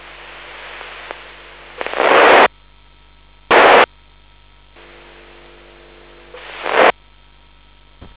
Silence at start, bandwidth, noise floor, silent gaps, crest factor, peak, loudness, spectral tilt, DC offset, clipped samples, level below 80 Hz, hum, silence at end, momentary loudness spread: 0.6 s; 4 kHz; -48 dBFS; none; 18 dB; 0 dBFS; -11 LUFS; -6.5 dB/octave; 0.2%; under 0.1%; -48 dBFS; none; 1.25 s; 26 LU